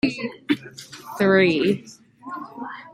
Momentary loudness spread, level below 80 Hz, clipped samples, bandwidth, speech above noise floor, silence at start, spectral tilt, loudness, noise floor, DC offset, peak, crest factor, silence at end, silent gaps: 21 LU; -60 dBFS; under 0.1%; 15.5 kHz; 21 dB; 0.05 s; -6 dB/octave; -21 LUFS; -41 dBFS; under 0.1%; -4 dBFS; 20 dB; 0.05 s; none